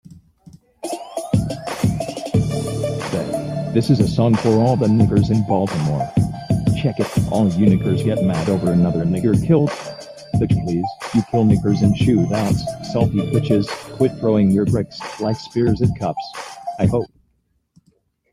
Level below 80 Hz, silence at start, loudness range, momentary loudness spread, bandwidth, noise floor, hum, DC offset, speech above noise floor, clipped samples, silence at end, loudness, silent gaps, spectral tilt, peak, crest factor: -40 dBFS; 0.1 s; 5 LU; 10 LU; 14.5 kHz; -66 dBFS; none; under 0.1%; 49 dB; under 0.1%; 1.25 s; -19 LUFS; none; -7.5 dB/octave; -2 dBFS; 16 dB